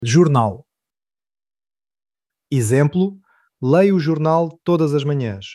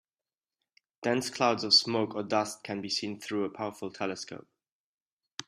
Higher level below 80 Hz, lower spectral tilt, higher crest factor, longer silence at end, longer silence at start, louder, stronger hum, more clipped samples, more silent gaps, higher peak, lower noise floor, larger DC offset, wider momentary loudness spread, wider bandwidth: first, -60 dBFS vs -76 dBFS; first, -7 dB/octave vs -3 dB/octave; second, 16 dB vs 24 dB; about the same, 0 s vs 0.05 s; second, 0 s vs 1 s; first, -18 LUFS vs -29 LUFS; neither; neither; second, none vs 4.72-5.20 s; first, -2 dBFS vs -8 dBFS; about the same, under -90 dBFS vs under -90 dBFS; neither; second, 9 LU vs 16 LU; second, 12.5 kHz vs 14.5 kHz